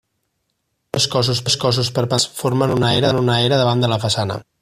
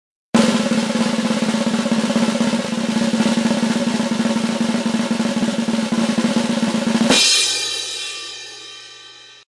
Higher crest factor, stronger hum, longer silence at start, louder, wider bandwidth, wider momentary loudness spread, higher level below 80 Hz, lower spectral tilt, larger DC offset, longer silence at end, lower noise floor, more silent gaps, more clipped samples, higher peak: about the same, 16 dB vs 16 dB; neither; first, 0.95 s vs 0.35 s; about the same, -17 LUFS vs -18 LUFS; first, 15 kHz vs 12 kHz; second, 4 LU vs 12 LU; first, -50 dBFS vs -58 dBFS; about the same, -4.5 dB/octave vs -3.5 dB/octave; neither; about the same, 0.2 s vs 0.15 s; first, -71 dBFS vs -42 dBFS; neither; neither; about the same, -2 dBFS vs -2 dBFS